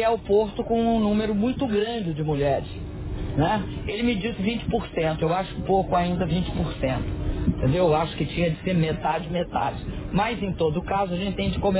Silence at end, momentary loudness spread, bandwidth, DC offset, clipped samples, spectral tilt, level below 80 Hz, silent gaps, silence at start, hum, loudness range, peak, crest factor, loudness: 0 s; 6 LU; 4 kHz; under 0.1%; under 0.1%; -11 dB/octave; -36 dBFS; none; 0 s; none; 2 LU; -10 dBFS; 14 dB; -25 LUFS